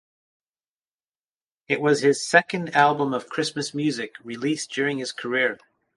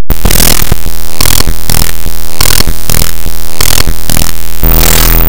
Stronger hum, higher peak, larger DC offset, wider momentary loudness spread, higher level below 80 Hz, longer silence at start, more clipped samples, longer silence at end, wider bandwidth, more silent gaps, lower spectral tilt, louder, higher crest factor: neither; about the same, -2 dBFS vs 0 dBFS; second, under 0.1% vs 80%; about the same, 10 LU vs 11 LU; second, -72 dBFS vs -12 dBFS; first, 1.7 s vs 0 s; second, under 0.1% vs 20%; first, 0.4 s vs 0 s; second, 11.5 kHz vs over 20 kHz; neither; first, -4 dB/octave vs -2.5 dB/octave; second, -23 LUFS vs -9 LUFS; first, 24 dB vs 14 dB